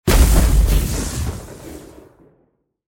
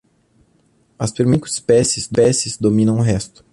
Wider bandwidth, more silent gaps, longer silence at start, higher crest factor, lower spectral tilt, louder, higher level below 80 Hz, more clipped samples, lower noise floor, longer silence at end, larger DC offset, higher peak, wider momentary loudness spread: first, 17 kHz vs 11.5 kHz; neither; second, 0.05 s vs 1 s; about the same, 16 dB vs 16 dB; about the same, -5 dB/octave vs -5.5 dB/octave; about the same, -18 LUFS vs -17 LUFS; first, -18 dBFS vs -44 dBFS; neither; first, -63 dBFS vs -58 dBFS; first, 1.05 s vs 0.25 s; neither; about the same, -2 dBFS vs -2 dBFS; first, 22 LU vs 7 LU